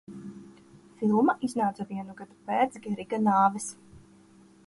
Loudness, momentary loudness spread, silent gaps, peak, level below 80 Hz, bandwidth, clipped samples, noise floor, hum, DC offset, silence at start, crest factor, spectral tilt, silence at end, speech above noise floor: -27 LUFS; 20 LU; none; -10 dBFS; -68 dBFS; 11.5 kHz; under 0.1%; -56 dBFS; none; under 0.1%; 0.1 s; 18 dB; -6 dB/octave; 0.7 s; 29 dB